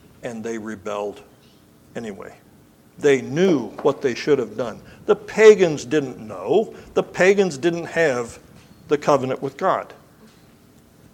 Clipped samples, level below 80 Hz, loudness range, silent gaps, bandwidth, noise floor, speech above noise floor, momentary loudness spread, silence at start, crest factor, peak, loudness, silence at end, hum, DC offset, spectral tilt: under 0.1%; -60 dBFS; 6 LU; none; 11 kHz; -52 dBFS; 32 dB; 17 LU; 0.25 s; 22 dB; 0 dBFS; -20 LUFS; 1.2 s; none; under 0.1%; -5.5 dB/octave